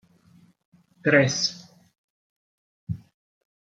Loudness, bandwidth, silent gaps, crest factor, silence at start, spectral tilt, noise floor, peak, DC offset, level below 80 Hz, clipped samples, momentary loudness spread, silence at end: -23 LUFS; 9.2 kHz; 1.98-2.87 s; 26 dB; 1.05 s; -4 dB/octave; -57 dBFS; -4 dBFS; under 0.1%; -64 dBFS; under 0.1%; 23 LU; 0.65 s